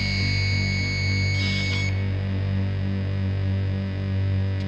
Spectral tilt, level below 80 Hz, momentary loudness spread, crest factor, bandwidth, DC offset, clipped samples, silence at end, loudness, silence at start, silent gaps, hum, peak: -5.5 dB/octave; -40 dBFS; 4 LU; 10 dB; 7.6 kHz; under 0.1%; under 0.1%; 0 s; -24 LUFS; 0 s; none; 50 Hz at -45 dBFS; -12 dBFS